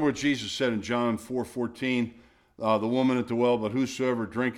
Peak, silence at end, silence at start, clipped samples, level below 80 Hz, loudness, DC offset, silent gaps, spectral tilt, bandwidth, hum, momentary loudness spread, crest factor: -10 dBFS; 0 s; 0 s; under 0.1%; -62 dBFS; -28 LUFS; under 0.1%; none; -5.5 dB/octave; 13.5 kHz; none; 6 LU; 18 dB